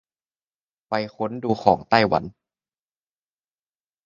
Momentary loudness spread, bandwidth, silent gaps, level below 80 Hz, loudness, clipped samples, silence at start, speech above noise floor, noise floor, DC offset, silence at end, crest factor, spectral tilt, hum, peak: 10 LU; 7.4 kHz; none; -56 dBFS; -22 LUFS; under 0.1%; 0.9 s; over 69 dB; under -90 dBFS; under 0.1%; 1.75 s; 26 dB; -6.5 dB/octave; none; 0 dBFS